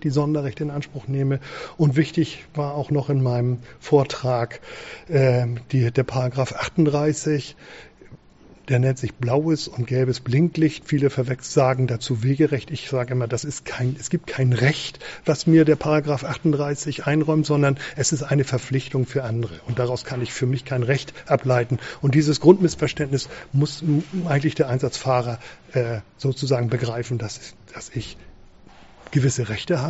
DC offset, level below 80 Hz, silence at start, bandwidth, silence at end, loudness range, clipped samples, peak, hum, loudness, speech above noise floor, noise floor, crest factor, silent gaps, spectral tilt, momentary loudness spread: under 0.1%; -52 dBFS; 0 s; 8 kHz; 0 s; 4 LU; under 0.1%; 0 dBFS; none; -22 LUFS; 28 dB; -49 dBFS; 22 dB; none; -6.5 dB/octave; 9 LU